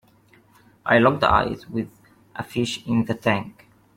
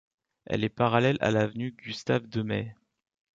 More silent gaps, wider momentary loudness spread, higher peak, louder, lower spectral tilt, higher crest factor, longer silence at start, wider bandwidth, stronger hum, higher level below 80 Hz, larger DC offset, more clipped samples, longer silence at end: neither; first, 19 LU vs 11 LU; first, -4 dBFS vs -8 dBFS; first, -22 LUFS vs -28 LUFS; about the same, -6 dB/octave vs -6.5 dB/octave; about the same, 20 dB vs 20 dB; first, 0.85 s vs 0.5 s; first, 15.5 kHz vs 7.6 kHz; neither; first, -46 dBFS vs -60 dBFS; neither; neither; second, 0.45 s vs 0.65 s